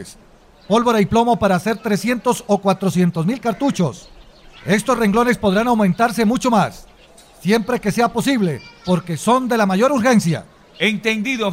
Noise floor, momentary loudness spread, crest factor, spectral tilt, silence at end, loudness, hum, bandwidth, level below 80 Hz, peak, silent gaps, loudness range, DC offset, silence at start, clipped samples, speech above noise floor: -46 dBFS; 6 LU; 14 dB; -5.5 dB/octave; 0 s; -17 LUFS; none; 16 kHz; -46 dBFS; -4 dBFS; none; 2 LU; under 0.1%; 0 s; under 0.1%; 29 dB